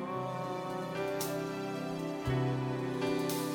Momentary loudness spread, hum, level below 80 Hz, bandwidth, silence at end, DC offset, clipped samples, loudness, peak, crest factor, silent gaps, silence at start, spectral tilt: 5 LU; none; -58 dBFS; 17 kHz; 0 s; under 0.1%; under 0.1%; -35 LUFS; -20 dBFS; 14 dB; none; 0 s; -5.5 dB/octave